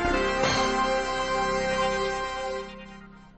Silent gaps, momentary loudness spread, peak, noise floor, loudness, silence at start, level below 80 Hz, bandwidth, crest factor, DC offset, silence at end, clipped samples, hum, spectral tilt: none; 13 LU; -12 dBFS; -46 dBFS; -26 LUFS; 0 s; -42 dBFS; 8.8 kHz; 16 dB; under 0.1%; 0.05 s; under 0.1%; none; -3.5 dB/octave